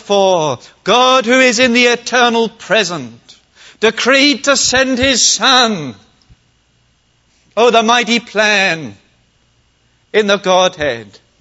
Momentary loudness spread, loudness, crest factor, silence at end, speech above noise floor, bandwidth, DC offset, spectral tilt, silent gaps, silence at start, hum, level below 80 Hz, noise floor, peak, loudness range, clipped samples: 12 LU; -11 LUFS; 14 dB; 0.35 s; 44 dB; 8.2 kHz; under 0.1%; -2 dB/octave; none; 0.05 s; none; -48 dBFS; -56 dBFS; 0 dBFS; 3 LU; under 0.1%